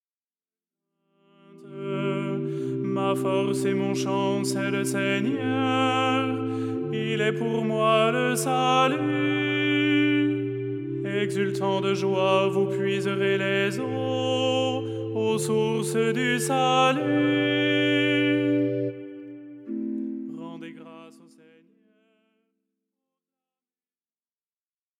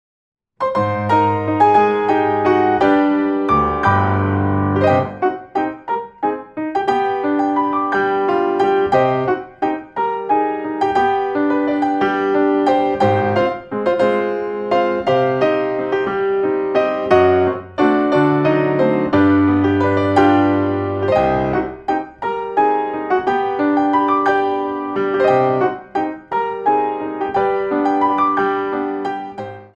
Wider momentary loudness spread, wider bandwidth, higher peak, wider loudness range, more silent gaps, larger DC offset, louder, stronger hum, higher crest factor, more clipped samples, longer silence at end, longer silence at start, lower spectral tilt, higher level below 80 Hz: first, 11 LU vs 8 LU; first, 16 kHz vs 8 kHz; second, -8 dBFS vs -2 dBFS; first, 8 LU vs 3 LU; neither; neither; second, -24 LUFS vs -17 LUFS; neither; about the same, 18 dB vs 16 dB; neither; first, 3.9 s vs 0.1 s; first, 1.55 s vs 0.6 s; second, -5 dB/octave vs -8 dB/octave; second, -82 dBFS vs -48 dBFS